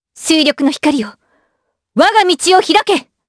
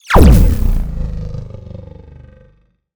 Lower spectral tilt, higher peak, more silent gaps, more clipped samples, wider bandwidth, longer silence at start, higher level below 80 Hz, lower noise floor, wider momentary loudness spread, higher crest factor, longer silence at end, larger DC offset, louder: second, -2 dB/octave vs -7 dB/octave; about the same, 0 dBFS vs 0 dBFS; neither; neither; second, 11 kHz vs over 20 kHz; first, 0.15 s vs 0 s; second, -56 dBFS vs -16 dBFS; first, -68 dBFS vs -52 dBFS; second, 9 LU vs 24 LU; about the same, 14 dB vs 14 dB; first, 0.25 s vs 0 s; neither; about the same, -12 LUFS vs -13 LUFS